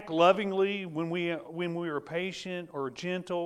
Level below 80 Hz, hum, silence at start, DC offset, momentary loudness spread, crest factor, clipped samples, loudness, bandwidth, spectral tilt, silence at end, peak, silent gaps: -72 dBFS; none; 0 s; under 0.1%; 12 LU; 20 dB; under 0.1%; -31 LUFS; 11.5 kHz; -6 dB/octave; 0 s; -10 dBFS; none